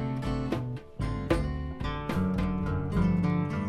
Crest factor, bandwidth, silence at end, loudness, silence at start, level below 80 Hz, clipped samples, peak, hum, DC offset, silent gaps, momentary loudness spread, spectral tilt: 18 dB; 12.5 kHz; 0 s; -30 LUFS; 0 s; -38 dBFS; under 0.1%; -12 dBFS; none; under 0.1%; none; 8 LU; -8 dB/octave